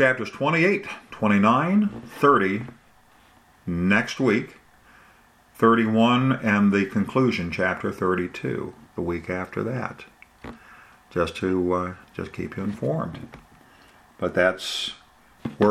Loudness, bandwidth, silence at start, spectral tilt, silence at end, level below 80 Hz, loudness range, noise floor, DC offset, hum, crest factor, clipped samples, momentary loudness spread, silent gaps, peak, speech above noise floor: -23 LUFS; 13 kHz; 0 s; -6.5 dB/octave; 0 s; -56 dBFS; 7 LU; -56 dBFS; under 0.1%; none; 20 dB; under 0.1%; 17 LU; none; -4 dBFS; 33 dB